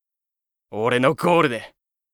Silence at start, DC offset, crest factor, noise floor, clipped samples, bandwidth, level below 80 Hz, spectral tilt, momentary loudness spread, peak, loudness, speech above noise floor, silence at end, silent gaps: 0.7 s; under 0.1%; 18 dB; -87 dBFS; under 0.1%; 18 kHz; -64 dBFS; -6 dB/octave; 13 LU; -4 dBFS; -20 LUFS; 67 dB; 0.45 s; none